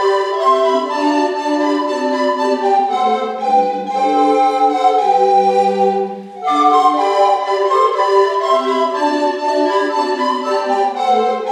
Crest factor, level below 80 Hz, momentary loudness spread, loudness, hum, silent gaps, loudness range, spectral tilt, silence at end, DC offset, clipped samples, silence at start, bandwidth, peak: 14 dB; -74 dBFS; 5 LU; -15 LUFS; none; none; 2 LU; -4 dB/octave; 0 s; under 0.1%; under 0.1%; 0 s; 10.5 kHz; -2 dBFS